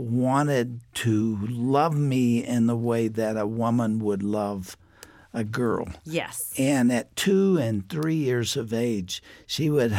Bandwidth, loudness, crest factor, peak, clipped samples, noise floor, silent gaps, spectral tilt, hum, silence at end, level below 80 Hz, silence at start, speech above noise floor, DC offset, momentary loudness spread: 17 kHz; -25 LUFS; 14 dB; -10 dBFS; under 0.1%; -51 dBFS; none; -6 dB/octave; none; 0 s; -58 dBFS; 0 s; 26 dB; under 0.1%; 9 LU